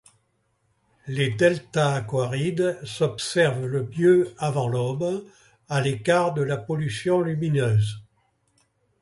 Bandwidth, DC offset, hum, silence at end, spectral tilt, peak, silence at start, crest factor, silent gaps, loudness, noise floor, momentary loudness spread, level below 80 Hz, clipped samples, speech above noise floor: 11.5 kHz; under 0.1%; none; 1 s; -6 dB/octave; -4 dBFS; 1.05 s; 20 dB; none; -24 LUFS; -70 dBFS; 7 LU; -58 dBFS; under 0.1%; 47 dB